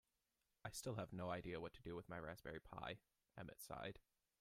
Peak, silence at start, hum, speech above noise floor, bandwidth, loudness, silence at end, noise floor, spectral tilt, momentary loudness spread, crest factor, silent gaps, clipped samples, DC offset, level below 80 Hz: -34 dBFS; 0.65 s; none; 38 dB; 15.5 kHz; -53 LUFS; 0.4 s; -90 dBFS; -5 dB/octave; 10 LU; 20 dB; none; under 0.1%; under 0.1%; -72 dBFS